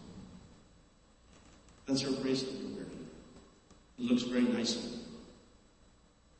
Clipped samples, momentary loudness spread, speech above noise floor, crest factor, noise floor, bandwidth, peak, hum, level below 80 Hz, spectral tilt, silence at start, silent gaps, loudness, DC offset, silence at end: under 0.1%; 24 LU; 31 dB; 20 dB; -64 dBFS; 8.4 kHz; -18 dBFS; none; -64 dBFS; -4.5 dB/octave; 0 s; none; -35 LUFS; under 0.1%; 1 s